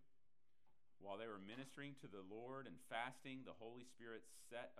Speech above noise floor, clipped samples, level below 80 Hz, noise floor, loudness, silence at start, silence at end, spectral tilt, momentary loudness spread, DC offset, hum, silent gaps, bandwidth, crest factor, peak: 35 dB; under 0.1%; under -90 dBFS; -90 dBFS; -55 LUFS; 1 s; 0 s; -4.5 dB/octave; 10 LU; under 0.1%; none; none; 13 kHz; 24 dB; -32 dBFS